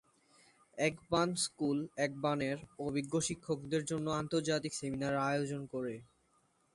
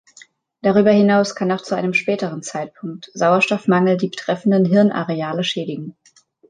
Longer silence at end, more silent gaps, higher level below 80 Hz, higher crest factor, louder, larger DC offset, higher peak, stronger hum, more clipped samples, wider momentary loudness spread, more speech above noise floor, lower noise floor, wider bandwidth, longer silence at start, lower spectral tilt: about the same, 0.7 s vs 0.6 s; neither; second, -68 dBFS vs -62 dBFS; about the same, 20 dB vs 16 dB; second, -36 LUFS vs -18 LUFS; neither; second, -18 dBFS vs -2 dBFS; neither; neither; second, 7 LU vs 14 LU; about the same, 38 dB vs 36 dB; first, -74 dBFS vs -54 dBFS; first, 11.5 kHz vs 9.4 kHz; about the same, 0.75 s vs 0.65 s; second, -4.5 dB/octave vs -6 dB/octave